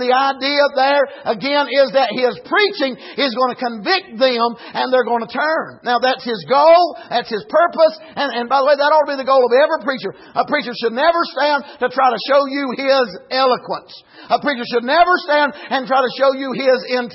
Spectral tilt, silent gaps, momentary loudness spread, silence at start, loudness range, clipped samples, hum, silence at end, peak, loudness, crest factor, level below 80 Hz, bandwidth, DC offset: -6.5 dB/octave; none; 8 LU; 0 s; 3 LU; under 0.1%; none; 0 s; -2 dBFS; -16 LUFS; 14 dB; -62 dBFS; 6 kHz; under 0.1%